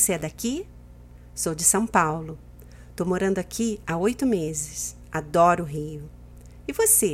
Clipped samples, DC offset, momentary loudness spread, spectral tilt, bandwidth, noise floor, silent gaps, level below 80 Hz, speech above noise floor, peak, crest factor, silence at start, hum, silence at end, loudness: under 0.1%; under 0.1%; 20 LU; -4 dB/octave; 16 kHz; -46 dBFS; none; -46 dBFS; 22 dB; -4 dBFS; 22 dB; 0 s; 60 Hz at -45 dBFS; 0 s; -24 LUFS